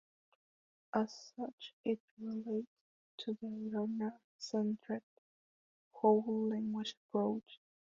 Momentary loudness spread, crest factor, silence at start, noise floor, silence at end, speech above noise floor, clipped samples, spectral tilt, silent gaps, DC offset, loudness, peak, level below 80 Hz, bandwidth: 13 LU; 22 dB; 0.95 s; under -90 dBFS; 0.35 s; over 52 dB; under 0.1%; -5.5 dB/octave; 1.53-1.58 s, 1.73-1.84 s, 2.00-2.17 s, 2.67-3.18 s, 4.24-4.39 s, 5.03-5.91 s, 6.97-7.09 s; under 0.1%; -39 LUFS; -18 dBFS; -82 dBFS; 7.4 kHz